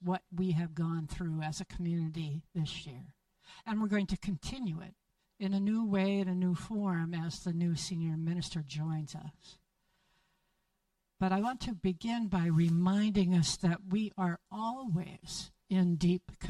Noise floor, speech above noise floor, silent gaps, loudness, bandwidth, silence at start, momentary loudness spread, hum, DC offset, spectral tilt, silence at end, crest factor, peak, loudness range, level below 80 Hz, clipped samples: -81 dBFS; 48 dB; none; -34 LUFS; 11.5 kHz; 0 s; 11 LU; none; under 0.1%; -6 dB/octave; 0 s; 16 dB; -18 dBFS; 7 LU; -56 dBFS; under 0.1%